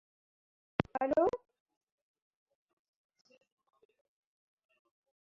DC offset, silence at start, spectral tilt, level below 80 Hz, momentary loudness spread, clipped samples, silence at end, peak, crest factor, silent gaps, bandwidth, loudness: under 0.1%; 0.8 s; -6 dB/octave; -68 dBFS; 10 LU; under 0.1%; 3.95 s; -10 dBFS; 32 dB; none; 7.2 kHz; -34 LUFS